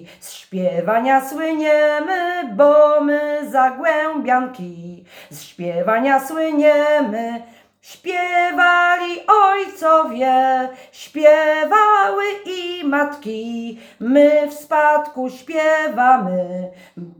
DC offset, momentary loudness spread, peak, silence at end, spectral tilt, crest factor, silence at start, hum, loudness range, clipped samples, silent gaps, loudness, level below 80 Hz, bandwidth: under 0.1%; 16 LU; 0 dBFS; 0.1 s; -5 dB/octave; 16 dB; 0 s; none; 4 LU; under 0.1%; none; -16 LUFS; -70 dBFS; 20 kHz